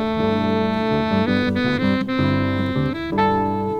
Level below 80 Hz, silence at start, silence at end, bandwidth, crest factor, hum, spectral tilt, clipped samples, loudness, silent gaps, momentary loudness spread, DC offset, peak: -44 dBFS; 0 s; 0 s; 8.4 kHz; 14 dB; none; -8 dB/octave; under 0.1%; -20 LUFS; none; 2 LU; under 0.1%; -6 dBFS